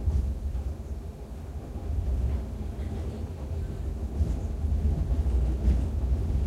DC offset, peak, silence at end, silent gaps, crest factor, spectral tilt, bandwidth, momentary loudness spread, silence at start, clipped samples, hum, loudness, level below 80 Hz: under 0.1%; -14 dBFS; 0 s; none; 16 dB; -8.5 dB/octave; 8.2 kHz; 11 LU; 0 s; under 0.1%; none; -31 LUFS; -30 dBFS